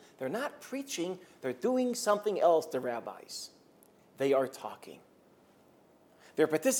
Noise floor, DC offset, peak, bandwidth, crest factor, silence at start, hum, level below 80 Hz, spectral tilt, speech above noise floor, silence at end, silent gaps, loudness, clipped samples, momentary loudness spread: -63 dBFS; under 0.1%; -14 dBFS; 18 kHz; 20 dB; 0.2 s; none; -88 dBFS; -3.5 dB/octave; 31 dB; 0 s; none; -32 LUFS; under 0.1%; 16 LU